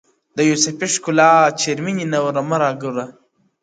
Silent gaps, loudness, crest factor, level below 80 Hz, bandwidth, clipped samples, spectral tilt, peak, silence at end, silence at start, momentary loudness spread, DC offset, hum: none; -17 LUFS; 18 dB; -66 dBFS; 9.6 kHz; under 0.1%; -3.5 dB/octave; 0 dBFS; 0.5 s; 0.35 s; 14 LU; under 0.1%; none